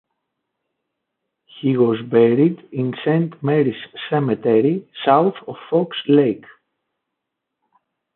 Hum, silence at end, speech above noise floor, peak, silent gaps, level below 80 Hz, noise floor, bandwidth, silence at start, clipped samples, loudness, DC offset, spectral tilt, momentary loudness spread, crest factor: none; 1.8 s; 62 dB; -2 dBFS; none; -68 dBFS; -80 dBFS; 4.2 kHz; 1.55 s; under 0.1%; -18 LUFS; under 0.1%; -12 dB/octave; 9 LU; 18 dB